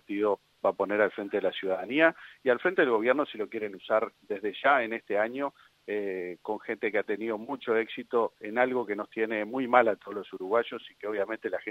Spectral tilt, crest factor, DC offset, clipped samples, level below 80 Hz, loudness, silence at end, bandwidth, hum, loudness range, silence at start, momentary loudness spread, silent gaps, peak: -6.5 dB/octave; 24 dB; under 0.1%; under 0.1%; -78 dBFS; -29 LUFS; 0 s; 7.8 kHz; none; 4 LU; 0.1 s; 11 LU; none; -4 dBFS